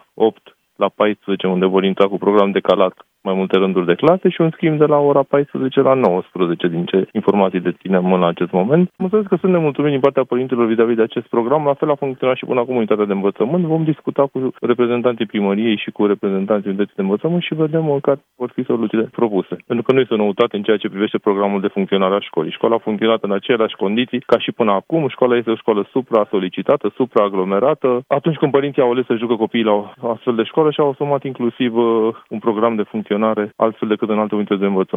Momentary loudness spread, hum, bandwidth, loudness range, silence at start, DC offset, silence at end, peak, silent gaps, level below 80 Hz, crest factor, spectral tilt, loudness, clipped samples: 5 LU; none; 4.7 kHz; 3 LU; 0.15 s; under 0.1%; 0 s; 0 dBFS; none; -66 dBFS; 16 dB; -9 dB/octave; -17 LUFS; under 0.1%